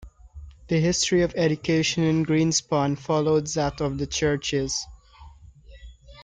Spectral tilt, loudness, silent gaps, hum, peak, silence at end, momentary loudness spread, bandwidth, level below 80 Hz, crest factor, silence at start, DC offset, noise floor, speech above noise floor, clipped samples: -4.5 dB/octave; -23 LUFS; none; none; -10 dBFS; 0 s; 6 LU; 9.6 kHz; -46 dBFS; 16 dB; 0 s; under 0.1%; -48 dBFS; 25 dB; under 0.1%